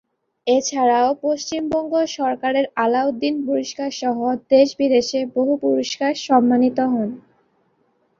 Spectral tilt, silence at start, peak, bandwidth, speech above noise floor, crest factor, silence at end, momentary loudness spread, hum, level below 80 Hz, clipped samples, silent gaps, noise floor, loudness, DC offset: -4 dB/octave; 0.45 s; -2 dBFS; 7.6 kHz; 45 dB; 18 dB; 1 s; 7 LU; none; -62 dBFS; under 0.1%; none; -64 dBFS; -19 LUFS; under 0.1%